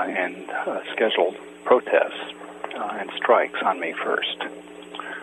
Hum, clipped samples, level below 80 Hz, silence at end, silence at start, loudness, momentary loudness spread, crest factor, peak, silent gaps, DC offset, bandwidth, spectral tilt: none; under 0.1%; -72 dBFS; 0 s; 0 s; -24 LUFS; 15 LU; 20 dB; -4 dBFS; none; under 0.1%; 11.5 kHz; -4 dB/octave